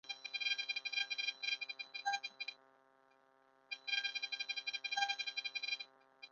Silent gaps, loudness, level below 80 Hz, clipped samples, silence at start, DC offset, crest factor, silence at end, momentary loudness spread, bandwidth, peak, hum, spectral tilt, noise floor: none; -40 LUFS; under -90 dBFS; under 0.1%; 0.05 s; under 0.1%; 24 dB; 0.05 s; 9 LU; 7.2 kHz; -20 dBFS; none; 6.5 dB/octave; -71 dBFS